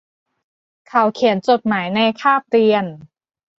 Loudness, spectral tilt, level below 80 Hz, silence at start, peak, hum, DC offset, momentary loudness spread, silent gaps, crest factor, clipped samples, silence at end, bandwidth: -17 LUFS; -6 dB/octave; -64 dBFS; 0.95 s; -2 dBFS; none; under 0.1%; 5 LU; none; 16 dB; under 0.1%; 0.55 s; 7.6 kHz